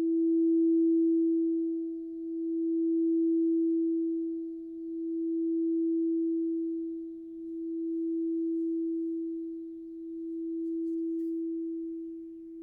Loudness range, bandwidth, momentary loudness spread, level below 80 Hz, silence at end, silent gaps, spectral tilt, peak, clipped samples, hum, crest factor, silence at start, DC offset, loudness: 6 LU; 0.7 kHz; 14 LU; -72 dBFS; 0 s; none; -11 dB/octave; -22 dBFS; under 0.1%; none; 8 dB; 0 s; under 0.1%; -31 LUFS